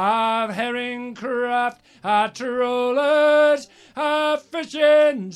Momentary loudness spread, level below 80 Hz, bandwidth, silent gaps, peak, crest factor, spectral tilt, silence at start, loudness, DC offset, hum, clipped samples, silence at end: 12 LU; -72 dBFS; 12 kHz; none; -6 dBFS; 14 dB; -4 dB/octave; 0 s; -20 LUFS; under 0.1%; none; under 0.1%; 0 s